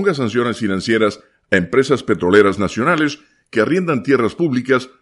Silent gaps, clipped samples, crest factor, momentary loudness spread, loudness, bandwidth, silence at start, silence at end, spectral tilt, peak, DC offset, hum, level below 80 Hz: none; under 0.1%; 16 dB; 7 LU; -17 LUFS; 11.5 kHz; 0 s; 0.15 s; -6 dB/octave; 0 dBFS; under 0.1%; none; -52 dBFS